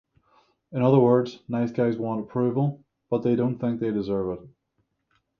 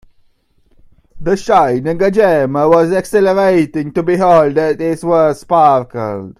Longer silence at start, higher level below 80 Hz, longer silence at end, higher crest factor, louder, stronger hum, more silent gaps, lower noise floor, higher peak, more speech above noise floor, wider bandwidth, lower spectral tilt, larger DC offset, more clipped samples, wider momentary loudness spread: second, 0.7 s vs 1.15 s; second, -60 dBFS vs -44 dBFS; first, 0.9 s vs 0.1 s; first, 20 dB vs 12 dB; second, -25 LUFS vs -12 LUFS; neither; neither; first, -74 dBFS vs -54 dBFS; second, -6 dBFS vs 0 dBFS; first, 51 dB vs 42 dB; second, 6.6 kHz vs 15 kHz; first, -10 dB/octave vs -7 dB/octave; neither; neither; first, 11 LU vs 7 LU